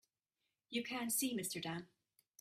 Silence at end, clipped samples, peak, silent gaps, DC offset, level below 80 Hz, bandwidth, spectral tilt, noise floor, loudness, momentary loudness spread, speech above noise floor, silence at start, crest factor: 0.55 s; under 0.1%; -26 dBFS; none; under 0.1%; -84 dBFS; 16 kHz; -2.5 dB/octave; -90 dBFS; -41 LUFS; 8 LU; 49 dB; 0.7 s; 18 dB